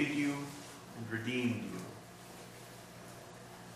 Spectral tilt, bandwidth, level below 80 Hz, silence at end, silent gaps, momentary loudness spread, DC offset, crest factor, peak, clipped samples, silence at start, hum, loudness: -5 dB/octave; 15.5 kHz; -72 dBFS; 0 s; none; 16 LU; under 0.1%; 20 dB; -20 dBFS; under 0.1%; 0 s; none; -40 LUFS